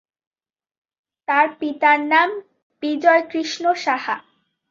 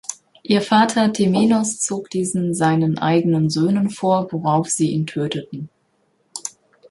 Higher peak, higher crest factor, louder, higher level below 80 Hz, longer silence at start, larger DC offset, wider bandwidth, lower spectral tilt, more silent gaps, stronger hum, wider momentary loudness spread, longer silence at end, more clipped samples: about the same, -2 dBFS vs -2 dBFS; about the same, 18 dB vs 16 dB; about the same, -19 LUFS vs -19 LUFS; second, -74 dBFS vs -60 dBFS; first, 1.3 s vs 0.1 s; neither; second, 7.6 kHz vs 11.5 kHz; second, -2.5 dB/octave vs -5 dB/octave; first, 2.62-2.70 s vs none; neither; second, 13 LU vs 16 LU; about the same, 0.5 s vs 0.4 s; neither